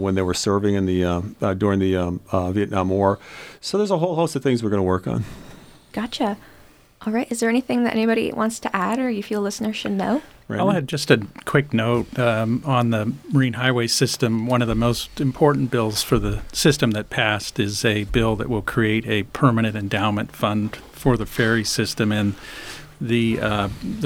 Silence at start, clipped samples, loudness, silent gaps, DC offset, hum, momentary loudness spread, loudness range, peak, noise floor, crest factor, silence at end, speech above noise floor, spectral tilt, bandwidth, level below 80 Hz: 0 s; under 0.1%; -21 LUFS; none; under 0.1%; none; 7 LU; 3 LU; -2 dBFS; -50 dBFS; 20 dB; 0 s; 29 dB; -5.5 dB/octave; 17.5 kHz; -42 dBFS